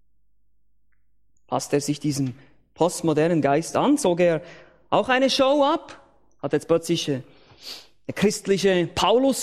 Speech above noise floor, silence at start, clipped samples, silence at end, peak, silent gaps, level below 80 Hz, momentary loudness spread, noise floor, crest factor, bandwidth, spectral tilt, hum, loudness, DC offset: 50 dB; 1.5 s; under 0.1%; 0 s; -4 dBFS; none; -56 dBFS; 12 LU; -72 dBFS; 20 dB; 15 kHz; -4.5 dB/octave; none; -22 LUFS; under 0.1%